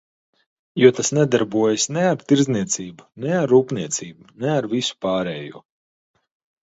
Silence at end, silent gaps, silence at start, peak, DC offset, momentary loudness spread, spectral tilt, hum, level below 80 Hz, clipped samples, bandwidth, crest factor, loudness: 1.05 s; none; 0.75 s; 0 dBFS; under 0.1%; 14 LU; -4.5 dB/octave; none; -62 dBFS; under 0.1%; 8.2 kHz; 20 dB; -20 LUFS